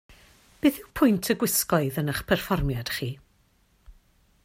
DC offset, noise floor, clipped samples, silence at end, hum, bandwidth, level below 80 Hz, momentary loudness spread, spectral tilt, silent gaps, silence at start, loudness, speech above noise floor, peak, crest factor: under 0.1%; -64 dBFS; under 0.1%; 0.55 s; none; 16.5 kHz; -44 dBFS; 8 LU; -4.5 dB/octave; none; 0.1 s; -25 LUFS; 39 dB; -8 dBFS; 20 dB